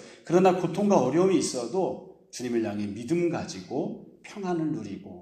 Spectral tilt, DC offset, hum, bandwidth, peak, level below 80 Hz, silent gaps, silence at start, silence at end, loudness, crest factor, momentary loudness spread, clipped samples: -6 dB/octave; under 0.1%; none; 13 kHz; -8 dBFS; -68 dBFS; none; 0 s; 0 s; -27 LUFS; 20 dB; 15 LU; under 0.1%